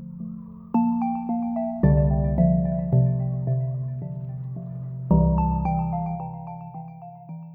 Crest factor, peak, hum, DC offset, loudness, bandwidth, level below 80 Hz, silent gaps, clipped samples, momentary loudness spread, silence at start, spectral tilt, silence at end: 18 dB; -6 dBFS; none; under 0.1%; -24 LUFS; 2.8 kHz; -34 dBFS; none; under 0.1%; 17 LU; 0 s; -14 dB/octave; 0 s